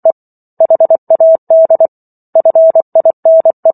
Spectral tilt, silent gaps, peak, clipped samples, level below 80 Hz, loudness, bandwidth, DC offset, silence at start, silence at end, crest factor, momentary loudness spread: -11 dB/octave; 0.12-0.57 s, 0.98-1.07 s, 1.38-1.47 s, 1.88-2.33 s, 2.82-2.92 s, 3.13-3.23 s, 3.53-3.63 s; 0 dBFS; under 0.1%; -72 dBFS; -9 LUFS; 1.7 kHz; under 0.1%; 0.05 s; 0 s; 8 dB; 7 LU